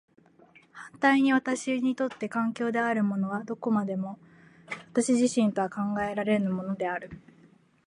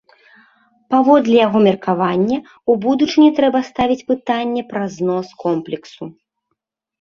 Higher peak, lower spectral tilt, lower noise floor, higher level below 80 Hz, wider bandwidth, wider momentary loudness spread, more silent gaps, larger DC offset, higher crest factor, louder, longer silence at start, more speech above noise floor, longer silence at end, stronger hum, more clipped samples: second, -8 dBFS vs 0 dBFS; about the same, -5.5 dB/octave vs -6.5 dB/octave; second, -59 dBFS vs -75 dBFS; second, -68 dBFS vs -54 dBFS; first, 11 kHz vs 7.2 kHz; about the same, 14 LU vs 12 LU; neither; neither; about the same, 20 dB vs 16 dB; second, -28 LUFS vs -16 LUFS; second, 0.75 s vs 0.9 s; second, 32 dB vs 59 dB; second, 0.7 s vs 0.9 s; neither; neither